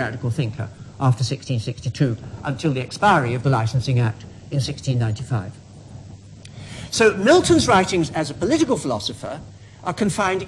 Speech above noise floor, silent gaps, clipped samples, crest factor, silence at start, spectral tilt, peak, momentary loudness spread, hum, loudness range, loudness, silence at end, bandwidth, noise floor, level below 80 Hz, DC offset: 20 dB; none; under 0.1%; 16 dB; 0 s; -5.5 dB/octave; -4 dBFS; 20 LU; none; 5 LU; -21 LUFS; 0 s; 12 kHz; -40 dBFS; -48 dBFS; under 0.1%